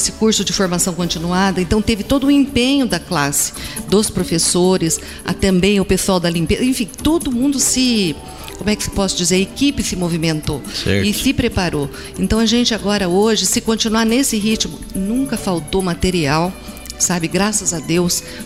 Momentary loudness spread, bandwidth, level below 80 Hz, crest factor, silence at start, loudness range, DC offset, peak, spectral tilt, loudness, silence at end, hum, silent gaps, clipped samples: 7 LU; 16 kHz; -34 dBFS; 14 dB; 0 s; 2 LU; 0.4%; -2 dBFS; -4 dB/octave; -16 LUFS; 0 s; none; none; under 0.1%